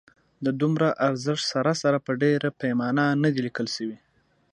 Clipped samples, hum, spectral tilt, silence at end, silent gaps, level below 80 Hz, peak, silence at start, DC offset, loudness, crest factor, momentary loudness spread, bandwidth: under 0.1%; none; -5.5 dB/octave; 0.55 s; none; -70 dBFS; -8 dBFS; 0.4 s; under 0.1%; -25 LUFS; 16 dB; 7 LU; 11 kHz